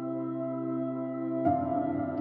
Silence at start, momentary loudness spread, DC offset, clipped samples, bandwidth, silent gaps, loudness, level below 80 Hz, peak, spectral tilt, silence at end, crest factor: 0 s; 5 LU; under 0.1%; under 0.1%; 3.5 kHz; none; -31 LUFS; -72 dBFS; -14 dBFS; -12 dB/octave; 0 s; 16 dB